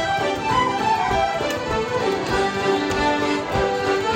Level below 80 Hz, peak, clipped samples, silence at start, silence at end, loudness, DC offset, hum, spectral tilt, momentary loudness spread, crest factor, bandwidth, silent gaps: -40 dBFS; -8 dBFS; under 0.1%; 0 s; 0 s; -21 LUFS; under 0.1%; none; -4.5 dB/octave; 3 LU; 14 dB; 16 kHz; none